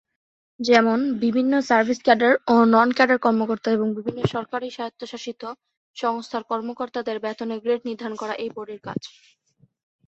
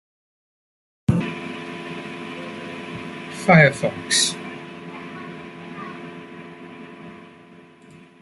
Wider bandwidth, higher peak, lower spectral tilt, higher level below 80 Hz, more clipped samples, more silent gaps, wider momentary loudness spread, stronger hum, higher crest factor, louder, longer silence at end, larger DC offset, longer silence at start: second, 7.8 kHz vs 12 kHz; about the same, -2 dBFS vs -2 dBFS; first, -5.5 dB/octave vs -4 dB/octave; second, -62 dBFS vs -54 dBFS; neither; first, 5.77-5.94 s vs none; second, 16 LU vs 23 LU; neither; about the same, 20 dB vs 24 dB; about the same, -22 LUFS vs -21 LUFS; first, 1 s vs 0.15 s; neither; second, 0.6 s vs 1.1 s